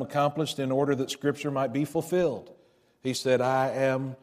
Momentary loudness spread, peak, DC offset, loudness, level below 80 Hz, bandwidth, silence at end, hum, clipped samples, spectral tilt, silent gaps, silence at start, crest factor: 5 LU; -12 dBFS; under 0.1%; -27 LUFS; -68 dBFS; 15.5 kHz; 0.1 s; none; under 0.1%; -5.5 dB/octave; none; 0 s; 16 dB